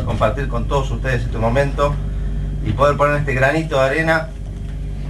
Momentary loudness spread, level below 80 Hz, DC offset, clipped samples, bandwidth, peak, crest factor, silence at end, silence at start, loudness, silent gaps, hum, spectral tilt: 10 LU; -24 dBFS; under 0.1%; under 0.1%; 12 kHz; -2 dBFS; 16 dB; 0 s; 0 s; -18 LUFS; none; none; -6.5 dB/octave